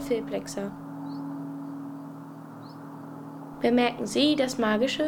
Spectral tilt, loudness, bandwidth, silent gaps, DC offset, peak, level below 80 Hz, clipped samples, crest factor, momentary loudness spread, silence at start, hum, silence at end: -4.5 dB/octave; -28 LUFS; 19 kHz; none; under 0.1%; -10 dBFS; -60 dBFS; under 0.1%; 18 dB; 19 LU; 0 s; none; 0 s